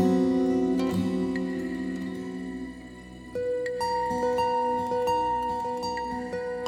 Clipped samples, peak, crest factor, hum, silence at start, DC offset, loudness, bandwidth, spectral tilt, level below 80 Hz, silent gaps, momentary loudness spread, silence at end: under 0.1%; -12 dBFS; 16 dB; none; 0 s; under 0.1%; -28 LUFS; 14.5 kHz; -6.5 dB/octave; -54 dBFS; none; 12 LU; 0 s